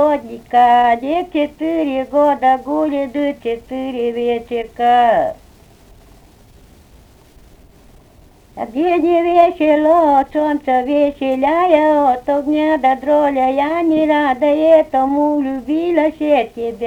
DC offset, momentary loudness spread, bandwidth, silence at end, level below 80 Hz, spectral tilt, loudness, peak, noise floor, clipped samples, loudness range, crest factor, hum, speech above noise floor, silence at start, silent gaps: under 0.1%; 8 LU; 10 kHz; 0 s; -48 dBFS; -6 dB/octave; -15 LUFS; 0 dBFS; -46 dBFS; under 0.1%; 6 LU; 14 dB; none; 31 dB; 0 s; none